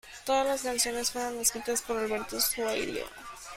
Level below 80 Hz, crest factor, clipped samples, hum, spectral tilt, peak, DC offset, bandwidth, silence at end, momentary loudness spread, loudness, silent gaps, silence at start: -58 dBFS; 18 dB; under 0.1%; none; -1 dB/octave; -12 dBFS; under 0.1%; 16.5 kHz; 0 s; 8 LU; -29 LUFS; none; 0.05 s